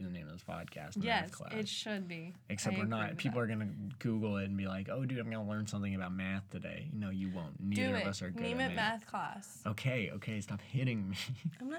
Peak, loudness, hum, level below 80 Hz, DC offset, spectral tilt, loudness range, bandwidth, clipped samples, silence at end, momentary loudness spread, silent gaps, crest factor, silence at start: -20 dBFS; -38 LUFS; none; -70 dBFS; under 0.1%; -5.5 dB/octave; 2 LU; 17 kHz; under 0.1%; 0 s; 9 LU; none; 18 dB; 0 s